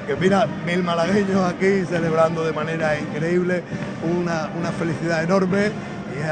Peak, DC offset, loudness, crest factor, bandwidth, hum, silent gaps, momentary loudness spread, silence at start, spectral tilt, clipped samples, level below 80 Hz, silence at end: -4 dBFS; under 0.1%; -21 LUFS; 18 dB; 9.4 kHz; none; none; 6 LU; 0 s; -6.5 dB/octave; under 0.1%; -52 dBFS; 0 s